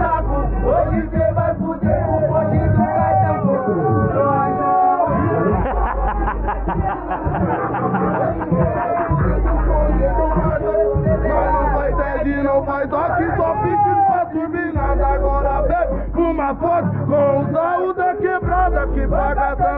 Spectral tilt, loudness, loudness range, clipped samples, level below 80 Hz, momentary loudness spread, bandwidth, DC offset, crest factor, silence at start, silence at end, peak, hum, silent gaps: -12.5 dB/octave; -18 LUFS; 3 LU; under 0.1%; -24 dBFS; 4 LU; 3.8 kHz; under 0.1%; 12 dB; 0 s; 0 s; -4 dBFS; none; none